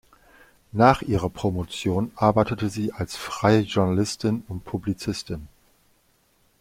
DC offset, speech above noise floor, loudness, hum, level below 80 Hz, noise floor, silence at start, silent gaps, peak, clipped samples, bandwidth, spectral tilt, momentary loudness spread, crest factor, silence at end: under 0.1%; 41 dB; -24 LUFS; none; -48 dBFS; -64 dBFS; 0.75 s; none; -2 dBFS; under 0.1%; 16 kHz; -6 dB/octave; 13 LU; 22 dB; 1.15 s